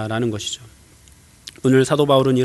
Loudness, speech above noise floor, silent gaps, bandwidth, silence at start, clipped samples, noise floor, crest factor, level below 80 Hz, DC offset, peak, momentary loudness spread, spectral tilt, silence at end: -18 LUFS; 31 dB; none; 12 kHz; 0 s; under 0.1%; -49 dBFS; 18 dB; -54 dBFS; under 0.1%; -2 dBFS; 20 LU; -5.5 dB/octave; 0 s